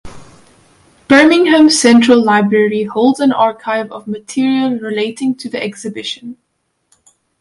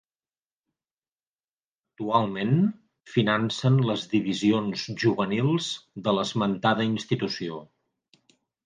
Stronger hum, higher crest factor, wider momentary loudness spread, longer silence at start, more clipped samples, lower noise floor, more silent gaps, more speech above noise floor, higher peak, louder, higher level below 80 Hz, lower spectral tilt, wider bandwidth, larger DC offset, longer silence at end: neither; second, 14 dB vs 20 dB; first, 15 LU vs 7 LU; second, 0.05 s vs 2 s; neither; second, -59 dBFS vs under -90 dBFS; neither; second, 47 dB vs over 65 dB; first, 0 dBFS vs -6 dBFS; first, -12 LUFS vs -25 LUFS; first, -52 dBFS vs -66 dBFS; second, -4 dB/octave vs -6 dB/octave; first, 11.5 kHz vs 9.6 kHz; neither; about the same, 1.05 s vs 1 s